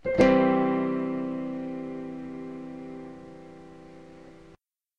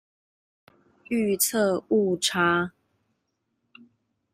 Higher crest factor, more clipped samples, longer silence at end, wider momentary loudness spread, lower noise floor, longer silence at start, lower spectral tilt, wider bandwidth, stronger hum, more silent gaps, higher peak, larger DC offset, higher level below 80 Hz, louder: about the same, 22 dB vs 18 dB; neither; second, 0.5 s vs 1.65 s; first, 27 LU vs 6 LU; second, -58 dBFS vs -77 dBFS; second, 0.05 s vs 1.1 s; first, -7.5 dB/octave vs -3.5 dB/octave; second, 8.2 kHz vs 16 kHz; neither; neither; about the same, -8 dBFS vs -8 dBFS; first, 0.1% vs under 0.1%; first, -54 dBFS vs -68 dBFS; second, -27 LUFS vs -24 LUFS